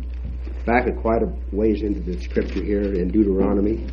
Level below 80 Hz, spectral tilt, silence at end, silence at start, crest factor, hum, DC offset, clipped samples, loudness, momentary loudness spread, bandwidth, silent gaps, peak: -28 dBFS; -9.5 dB/octave; 0 s; 0 s; 18 dB; none; under 0.1%; under 0.1%; -22 LUFS; 9 LU; 6.4 kHz; none; -2 dBFS